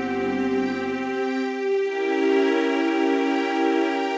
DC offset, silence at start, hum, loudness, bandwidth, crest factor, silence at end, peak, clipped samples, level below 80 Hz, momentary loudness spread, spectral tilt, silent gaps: under 0.1%; 0 s; none; -23 LUFS; 8 kHz; 12 dB; 0 s; -10 dBFS; under 0.1%; -64 dBFS; 5 LU; -5 dB/octave; none